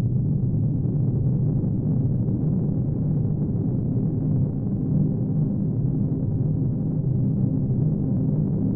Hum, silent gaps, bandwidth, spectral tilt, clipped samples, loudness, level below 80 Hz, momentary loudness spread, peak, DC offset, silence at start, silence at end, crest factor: none; none; 1.6 kHz; -16 dB/octave; under 0.1%; -24 LUFS; -38 dBFS; 2 LU; -12 dBFS; under 0.1%; 0 s; 0 s; 10 dB